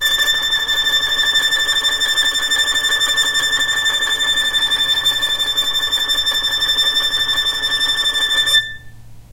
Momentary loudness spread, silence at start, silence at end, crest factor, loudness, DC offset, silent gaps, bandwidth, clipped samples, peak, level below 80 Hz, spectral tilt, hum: 2 LU; 0 s; 0 s; 14 dB; -14 LUFS; under 0.1%; none; 16 kHz; under 0.1%; -2 dBFS; -42 dBFS; 1.5 dB/octave; none